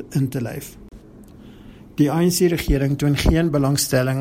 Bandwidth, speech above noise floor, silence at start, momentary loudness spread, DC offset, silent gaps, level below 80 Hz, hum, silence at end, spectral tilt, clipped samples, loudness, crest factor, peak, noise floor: 16.5 kHz; 24 dB; 0 s; 13 LU; under 0.1%; none; -30 dBFS; none; 0 s; -5.5 dB/octave; under 0.1%; -19 LUFS; 20 dB; 0 dBFS; -43 dBFS